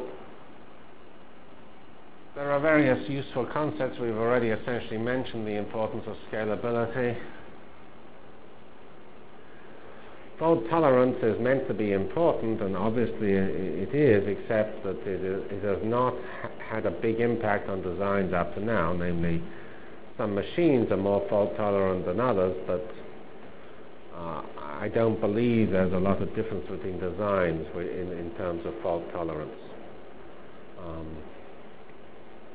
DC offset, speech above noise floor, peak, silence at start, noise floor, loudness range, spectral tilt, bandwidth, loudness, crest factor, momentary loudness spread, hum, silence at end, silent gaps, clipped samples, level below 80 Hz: 1%; 24 dB; -8 dBFS; 0 s; -51 dBFS; 8 LU; -11 dB/octave; 4 kHz; -28 LUFS; 22 dB; 22 LU; none; 0 s; none; under 0.1%; -52 dBFS